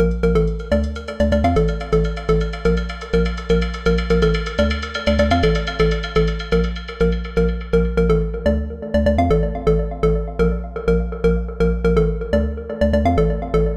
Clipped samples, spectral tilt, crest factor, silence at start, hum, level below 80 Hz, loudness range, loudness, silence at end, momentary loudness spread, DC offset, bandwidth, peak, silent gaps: under 0.1%; -7.5 dB/octave; 12 dB; 0 s; none; -24 dBFS; 1 LU; -19 LUFS; 0 s; 4 LU; under 0.1%; 8.8 kHz; -6 dBFS; none